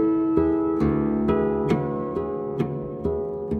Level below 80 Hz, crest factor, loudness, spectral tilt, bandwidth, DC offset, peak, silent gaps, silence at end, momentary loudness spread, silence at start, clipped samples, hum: -42 dBFS; 16 dB; -24 LUFS; -10 dB/octave; 6.2 kHz; under 0.1%; -8 dBFS; none; 0 s; 7 LU; 0 s; under 0.1%; none